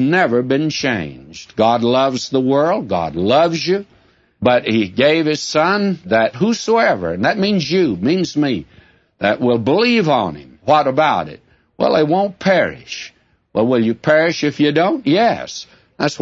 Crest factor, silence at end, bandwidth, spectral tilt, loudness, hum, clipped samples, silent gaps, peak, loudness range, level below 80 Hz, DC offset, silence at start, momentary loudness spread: 16 dB; 0.05 s; 8 kHz; -5.5 dB/octave; -16 LUFS; none; under 0.1%; none; -2 dBFS; 1 LU; -52 dBFS; under 0.1%; 0 s; 9 LU